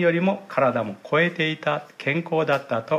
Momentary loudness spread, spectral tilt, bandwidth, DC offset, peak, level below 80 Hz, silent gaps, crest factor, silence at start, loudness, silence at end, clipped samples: 6 LU; -7 dB/octave; 13.5 kHz; under 0.1%; -8 dBFS; -74 dBFS; none; 16 dB; 0 s; -23 LUFS; 0 s; under 0.1%